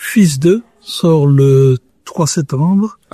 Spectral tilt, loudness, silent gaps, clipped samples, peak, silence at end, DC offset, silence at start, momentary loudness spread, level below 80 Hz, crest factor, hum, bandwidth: -6.5 dB/octave; -12 LUFS; none; under 0.1%; 0 dBFS; 0.2 s; under 0.1%; 0 s; 9 LU; -50 dBFS; 12 dB; none; 14 kHz